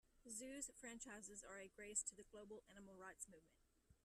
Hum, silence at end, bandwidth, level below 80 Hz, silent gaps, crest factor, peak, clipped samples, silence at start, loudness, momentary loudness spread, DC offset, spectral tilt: none; 0.1 s; 13.5 kHz; -78 dBFS; none; 26 dB; -32 dBFS; under 0.1%; 0.05 s; -53 LUFS; 14 LU; under 0.1%; -2 dB/octave